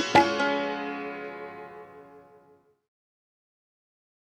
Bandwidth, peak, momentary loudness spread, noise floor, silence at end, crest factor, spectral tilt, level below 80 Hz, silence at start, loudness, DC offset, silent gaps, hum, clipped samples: 12.5 kHz; -6 dBFS; 25 LU; -61 dBFS; 2.1 s; 24 dB; -4 dB/octave; -68 dBFS; 0 s; -27 LUFS; under 0.1%; none; none; under 0.1%